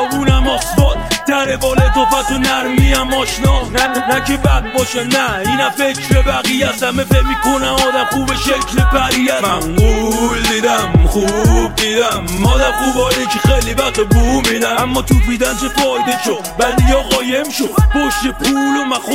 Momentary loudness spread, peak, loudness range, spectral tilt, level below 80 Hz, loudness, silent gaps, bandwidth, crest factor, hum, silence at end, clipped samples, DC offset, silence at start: 3 LU; 0 dBFS; 1 LU; -4.5 dB/octave; -18 dBFS; -13 LUFS; none; 16.5 kHz; 12 dB; none; 0 s; under 0.1%; 0.3%; 0 s